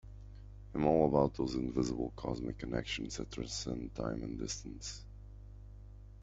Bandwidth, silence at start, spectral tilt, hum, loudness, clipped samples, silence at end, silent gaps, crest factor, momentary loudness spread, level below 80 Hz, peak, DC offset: 8.2 kHz; 0.05 s; -5.5 dB/octave; 50 Hz at -50 dBFS; -36 LUFS; under 0.1%; 0 s; none; 24 dB; 24 LU; -50 dBFS; -14 dBFS; under 0.1%